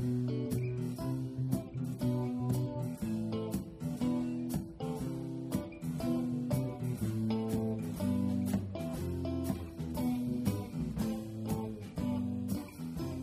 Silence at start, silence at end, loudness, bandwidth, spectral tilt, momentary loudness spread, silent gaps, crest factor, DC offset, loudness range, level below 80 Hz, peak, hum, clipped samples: 0 s; 0 s; -36 LUFS; 15.5 kHz; -7.5 dB/octave; 5 LU; none; 16 dB; under 0.1%; 2 LU; -54 dBFS; -18 dBFS; none; under 0.1%